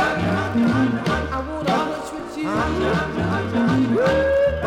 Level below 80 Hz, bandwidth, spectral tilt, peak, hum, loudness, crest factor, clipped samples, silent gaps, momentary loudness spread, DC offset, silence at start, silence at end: -36 dBFS; 14 kHz; -6.5 dB/octave; -8 dBFS; none; -21 LUFS; 12 dB; under 0.1%; none; 8 LU; under 0.1%; 0 s; 0 s